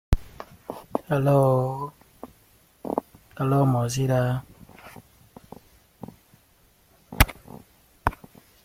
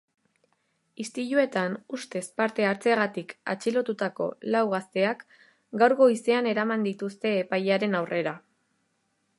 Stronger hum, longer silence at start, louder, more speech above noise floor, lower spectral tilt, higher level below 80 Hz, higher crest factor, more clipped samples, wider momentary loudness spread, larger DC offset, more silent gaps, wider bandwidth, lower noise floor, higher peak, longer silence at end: neither; second, 0.1 s vs 1 s; about the same, -25 LUFS vs -26 LUFS; second, 38 dB vs 48 dB; about the same, -6 dB/octave vs -5.5 dB/octave; first, -36 dBFS vs -80 dBFS; first, 26 dB vs 20 dB; neither; first, 25 LU vs 12 LU; neither; neither; first, 16.5 kHz vs 11.5 kHz; second, -60 dBFS vs -74 dBFS; first, 0 dBFS vs -6 dBFS; second, 0.5 s vs 1 s